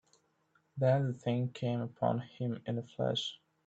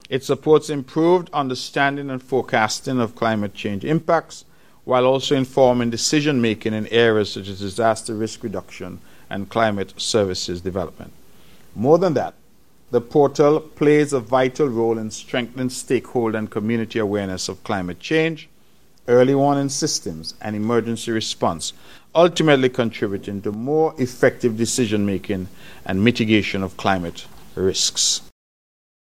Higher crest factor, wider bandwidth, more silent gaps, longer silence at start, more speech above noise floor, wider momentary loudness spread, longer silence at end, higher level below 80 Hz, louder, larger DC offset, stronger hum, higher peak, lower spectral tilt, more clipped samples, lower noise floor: about the same, 18 dB vs 20 dB; second, 8 kHz vs 16 kHz; neither; first, 0.75 s vs 0.1 s; about the same, 40 dB vs 37 dB; second, 9 LU vs 12 LU; second, 0.3 s vs 1 s; second, -72 dBFS vs -56 dBFS; second, -35 LUFS vs -20 LUFS; second, under 0.1% vs 0.6%; neither; second, -16 dBFS vs 0 dBFS; first, -7 dB/octave vs -4.5 dB/octave; neither; first, -74 dBFS vs -57 dBFS